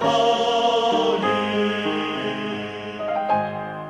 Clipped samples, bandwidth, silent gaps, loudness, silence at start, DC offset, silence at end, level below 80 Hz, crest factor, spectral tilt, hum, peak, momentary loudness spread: under 0.1%; 12 kHz; none; -22 LUFS; 0 s; under 0.1%; 0 s; -60 dBFS; 14 dB; -4.5 dB/octave; none; -8 dBFS; 9 LU